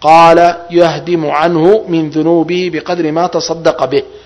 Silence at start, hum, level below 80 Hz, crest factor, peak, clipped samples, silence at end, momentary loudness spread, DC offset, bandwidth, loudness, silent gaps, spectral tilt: 0 s; none; -46 dBFS; 10 dB; 0 dBFS; 2%; 0.1 s; 9 LU; under 0.1%; 11 kHz; -11 LUFS; none; -5.5 dB/octave